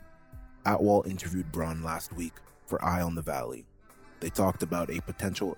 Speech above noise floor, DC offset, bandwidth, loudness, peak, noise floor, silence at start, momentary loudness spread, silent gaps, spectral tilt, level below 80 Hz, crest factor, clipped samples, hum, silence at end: 23 dB; under 0.1%; over 20 kHz; -31 LUFS; -12 dBFS; -53 dBFS; 0 s; 13 LU; none; -6 dB/octave; -52 dBFS; 20 dB; under 0.1%; none; 0 s